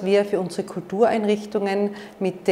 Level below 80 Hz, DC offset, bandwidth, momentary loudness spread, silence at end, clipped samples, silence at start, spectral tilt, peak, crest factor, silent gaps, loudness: -66 dBFS; under 0.1%; 13 kHz; 8 LU; 0 s; under 0.1%; 0 s; -6 dB/octave; -6 dBFS; 18 dB; none; -23 LUFS